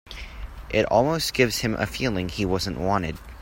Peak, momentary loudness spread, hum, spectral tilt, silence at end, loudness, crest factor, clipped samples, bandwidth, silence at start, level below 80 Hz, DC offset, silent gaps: -6 dBFS; 17 LU; none; -4.5 dB/octave; 0 s; -24 LUFS; 20 dB; under 0.1%; 16.5 kHz; 0.05 s; -40 dBFS; under 0.1%; none